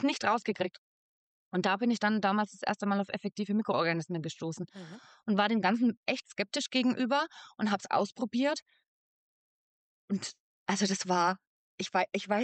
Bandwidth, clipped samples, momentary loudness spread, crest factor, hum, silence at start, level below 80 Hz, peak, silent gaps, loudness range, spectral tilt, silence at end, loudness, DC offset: 9 kHz; under 0.1%; 10 LU; 16 dB; none; 0 s; -82 dBFS; -16 dBFS; 0.78-1.51 s, 5.97-6.03 s, 8.62-8.66 s, 8.88-10.08 s, 10.40-10.66 s, 11.47-11.78 s; 4 LU; -4.5 dB/octave; 0 s; -31 LUFS; under 0.1%